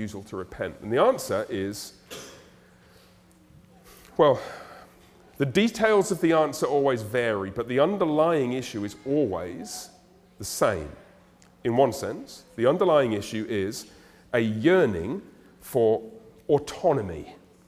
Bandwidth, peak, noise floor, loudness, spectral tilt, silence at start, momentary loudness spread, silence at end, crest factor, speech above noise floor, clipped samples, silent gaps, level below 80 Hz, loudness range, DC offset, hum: 16 kHz; -6 dBFS; -56 dBFS; -25 LUFS; -5.5 dB/octave; 0 s; 18 LU; 0.3 s; 20 dB; 31 dB; under 0.1%; none; -58 dBFS; 6 LU; under 0.1%; none